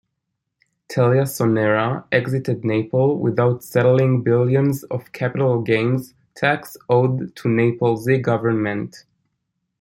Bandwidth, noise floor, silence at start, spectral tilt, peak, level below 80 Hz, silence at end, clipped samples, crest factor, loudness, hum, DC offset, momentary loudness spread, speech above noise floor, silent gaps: 16.5 kHz; -78 dBFS; 0.9 s; -7.5 dB/octave; -2 dBFS; -60 dBFS; 0.8 s; under 0.1%; 18 dB; -19 LUFS; none; under 0.1%; 8 LU; 59 dB; none